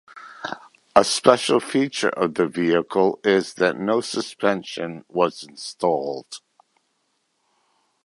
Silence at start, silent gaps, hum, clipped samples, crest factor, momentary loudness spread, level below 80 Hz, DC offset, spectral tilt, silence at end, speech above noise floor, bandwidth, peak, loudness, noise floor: 0.15 s; none; none; under 0.1%; 22 dB; 17 LU; -64 dBFS; under 0.1%; -4 dB/octave; 1.7 s; 50 dB; 11.5 kHz; 0 dBFS; -21 LUFS; -71 dBFS